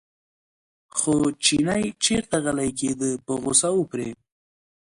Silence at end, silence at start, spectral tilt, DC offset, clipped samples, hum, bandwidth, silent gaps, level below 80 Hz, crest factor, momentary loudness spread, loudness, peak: 0.7 s; 0.95 s; -3 dB/octave; under 0.1%; under 0.1%; none; 11.5 kHz; none; -54 dBFS; 20 dB; 9 LU; -23 LUFS; -4 dBFS